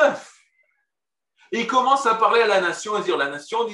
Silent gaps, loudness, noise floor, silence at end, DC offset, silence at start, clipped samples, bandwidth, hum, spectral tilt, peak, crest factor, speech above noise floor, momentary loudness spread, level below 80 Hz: none; -20 LUFS; -87 dBFS; 0 s; under 0.1%; 0 s; under 0.1%; 11.5 kHz; none; -3 dB/octave; -4 dBFS; 18 dB; 67 dB; 9 LU; -80 dBFS